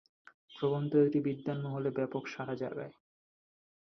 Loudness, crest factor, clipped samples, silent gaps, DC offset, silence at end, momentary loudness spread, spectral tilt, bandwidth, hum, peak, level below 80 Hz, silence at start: -34 LUFS; 18 dB; under 0.1%; none; under 0.1%; 0.95 s; 13 LU; -8.5 dB/octave; 6.4 kHz; none; -16 dBFS; -76 dBFS; 0.5 s